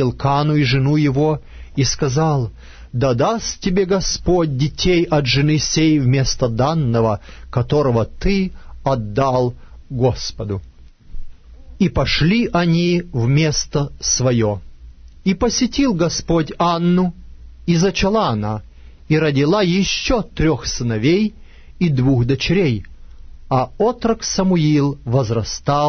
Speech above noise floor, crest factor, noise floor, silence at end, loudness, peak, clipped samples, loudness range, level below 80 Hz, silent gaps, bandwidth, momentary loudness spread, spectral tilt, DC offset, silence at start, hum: 23 dB; 14 dB; -39 dBFS; 0 s; -18 LUFS; -4 dBFS; under 0.1%; 3 LU; -34 dBFS; none; 6.6 kHz; 8 LU; -5.5 dB/octave; under 0.1%; 0 s; none